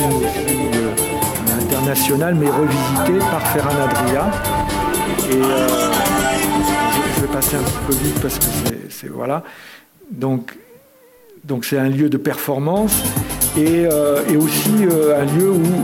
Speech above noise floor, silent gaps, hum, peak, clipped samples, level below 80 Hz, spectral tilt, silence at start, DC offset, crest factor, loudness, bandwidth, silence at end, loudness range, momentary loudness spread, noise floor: 32 dB; none; none; -2 dBFS; under 0.1%; -38 dBFS; -4.5 dB/octave; 0 s; under 0.1%; 16 dB; -17 LUFS; 17 kHz; 0 s; 6 LU; 8 LU; -48 dBFS